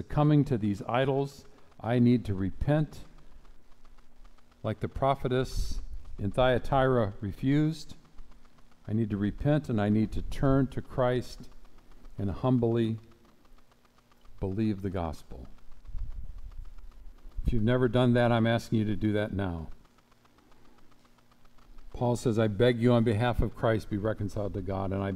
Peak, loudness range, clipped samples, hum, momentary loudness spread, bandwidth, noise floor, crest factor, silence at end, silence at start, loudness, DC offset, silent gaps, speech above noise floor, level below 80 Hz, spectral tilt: -12 dBFS; 8 LU; under 0.1%; none; 19 LU; 13.5 kHz; -61 dBFS; 18 dB; 0 s; 0 s; -29 LUFS; under 0.1%; none; 34 dB; -42 dBFS; -8 dB/octave